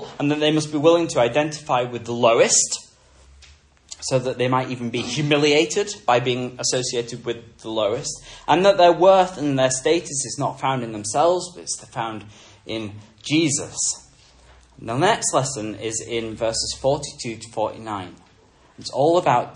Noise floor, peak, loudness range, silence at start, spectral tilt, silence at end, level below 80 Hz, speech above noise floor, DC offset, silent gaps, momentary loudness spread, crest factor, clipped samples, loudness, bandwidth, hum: -54 dBFS; -2 dBFS; 6 LU; 0 s; -3.5 dB/octave; 0 s; -54 dBFS; 33 dB; under 0.1%; none; 14 LU; 20 dB; under 0.1%; -21 LUFS; 11 kHz; none